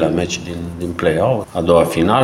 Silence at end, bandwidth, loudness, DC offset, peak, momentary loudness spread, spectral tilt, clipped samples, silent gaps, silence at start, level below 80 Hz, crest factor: 0 s; 16 kHz; -17 LUFS; under 0.1%; 0 dBFS; 11 LU; -6 dB/octave; under 0.1%; none; 0 s; -40 dBFS; 16 dB